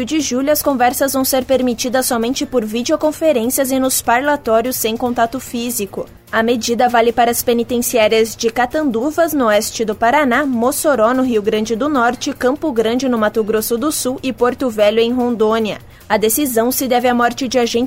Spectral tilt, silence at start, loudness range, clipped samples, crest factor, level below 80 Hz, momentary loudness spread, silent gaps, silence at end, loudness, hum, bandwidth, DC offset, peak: -3 dB/octave; 0 s; 2 LU; under 0.1%; 14 dB; -46 dBFS; 5 LU; none; 0 s; -15 LUFS; none; 16.5 kHz; under 0.1%; -2 dBFS